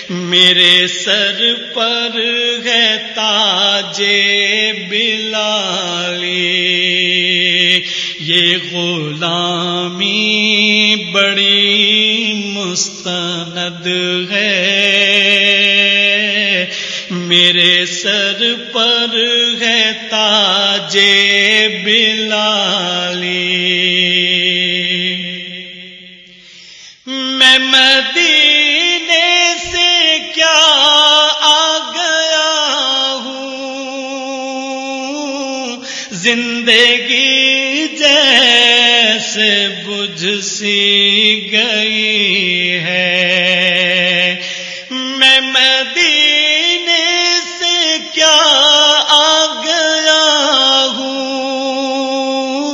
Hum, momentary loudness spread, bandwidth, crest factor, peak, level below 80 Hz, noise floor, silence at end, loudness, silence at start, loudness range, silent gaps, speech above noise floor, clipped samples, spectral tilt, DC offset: none; 12 LU; 11 kHz; 12 dB; 0 dBFS; -58 dBFS; -38 dBFS; 0 s; -10 LUFS; 0 s; 5 LU; none; 25 dB; 0.2%; -1.5 dB/octave; under 0.1%